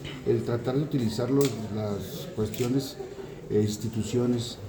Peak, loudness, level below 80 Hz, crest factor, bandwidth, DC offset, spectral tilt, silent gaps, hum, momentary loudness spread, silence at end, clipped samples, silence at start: -12 dBFS; -28 LUFS; -54 dBFS; 16 dB; over 20 kHz; under 0.1%; -6.5 dB/octave; none; none; 10 LU; 0 s; under 0.1%; 0 s